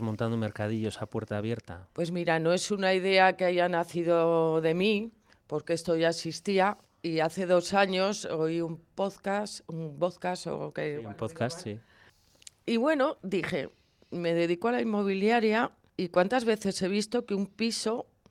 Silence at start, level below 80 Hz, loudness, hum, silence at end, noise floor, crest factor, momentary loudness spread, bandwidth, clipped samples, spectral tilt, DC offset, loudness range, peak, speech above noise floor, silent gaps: 0 s; -68 dBFS; -29 LUFS; none; 0.3 s; -61 dBFS; 20 dB; 12 LU; 14.5 kHz; under 0.1%; -5 dB/octave; under 0.1%; 7 LU; -10 dBFS; 32 dB; none